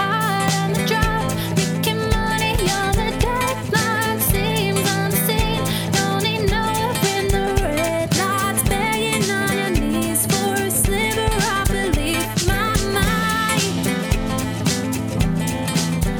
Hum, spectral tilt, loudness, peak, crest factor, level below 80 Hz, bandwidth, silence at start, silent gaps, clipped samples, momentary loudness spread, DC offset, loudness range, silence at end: none; -4 dB/octave; -19 LUFS; -4 dBFS; 16 dB; -28 dBFS; over 20 kHz; 0 s; none; under 0.1%; 3 LU; under 0.1%; 1 LU; 0 s